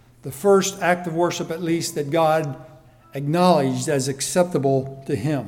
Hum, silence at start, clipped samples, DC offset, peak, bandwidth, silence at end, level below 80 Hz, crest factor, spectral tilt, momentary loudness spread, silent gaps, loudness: none; 0.25 s; under 0.1%; under 0.1%; -4 dBFS; 18.5 kHz; 0 s; -58 dBFS; 18 dB; -5 dB/octave; 11 LU; none; -21 LUFS